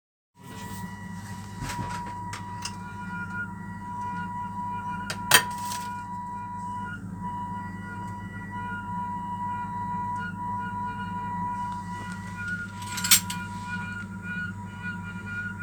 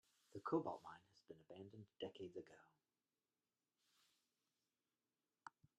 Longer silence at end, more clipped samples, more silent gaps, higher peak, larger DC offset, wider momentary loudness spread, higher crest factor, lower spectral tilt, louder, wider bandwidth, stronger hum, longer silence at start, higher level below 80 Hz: second, 0 s vs 0.3 s; neither; neither; first, 0 dBFS vs -28 dBFS; neither; second, 11 LU vs 21 LU; about the same, 30 dB vs 26 dB; second, -2.5 dB/octave vs -7 dB/octave; first, -30 LUFS vs -51 LUFS; first, over 20 kHz vs 11 kHz; neither; about the same, 0.35 s vs 0.35 s; first, -52 dBFS vs under -90 dBFS